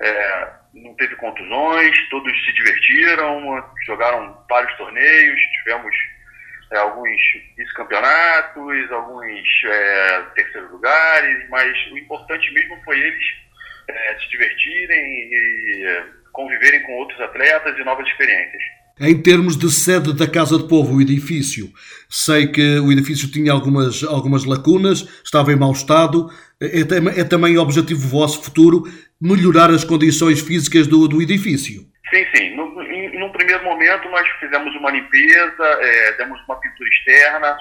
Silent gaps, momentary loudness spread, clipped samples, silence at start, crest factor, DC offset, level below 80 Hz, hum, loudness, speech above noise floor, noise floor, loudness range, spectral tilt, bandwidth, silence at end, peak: none; 14 LU; under 0.1%; 0 s; 16 dB; under 0.1%; -54 dBFS; none; -14 LUFS; 27 dB; -42 dBFS; 4 LU; -4.5 dB/octave; 19 kHz; 0 s; 0 dBFS